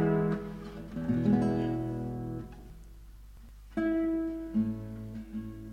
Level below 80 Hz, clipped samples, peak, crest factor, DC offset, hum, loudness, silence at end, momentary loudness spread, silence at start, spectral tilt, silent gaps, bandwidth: -50 dBFS; under 0.1%; -14 dBFS; 18 dB; under 0.1%; none; -33 LUFS; 0 s; 16 LU; 0 s; -9 dB/octave; none; 13 kHz